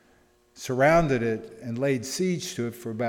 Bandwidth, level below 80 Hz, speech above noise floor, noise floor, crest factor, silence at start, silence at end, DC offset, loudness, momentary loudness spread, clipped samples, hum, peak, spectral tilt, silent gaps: 17.5 kHz; -48 dBFS; 36 dB; -61 dBFS; 18 dB; 0.55 s; 0 s; under 0.1%; -26 LUFS; 13 LU; under 0.1%; none; -8 dBFS; -5.5 dB/octave; none